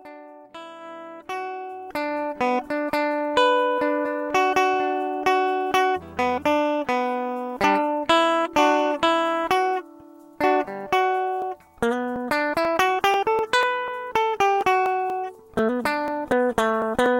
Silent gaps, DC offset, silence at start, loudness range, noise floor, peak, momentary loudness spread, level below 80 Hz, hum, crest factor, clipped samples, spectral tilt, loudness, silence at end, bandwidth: none; under 0.1%; 0.05 s; 3 LU; -46 dBFS; -4 dBFS; 11 LU; -56 dBFS; none; 20 dB; under 0.1%; -4 dB/octave; -23 LUFS; 0 s; 16.5 kHz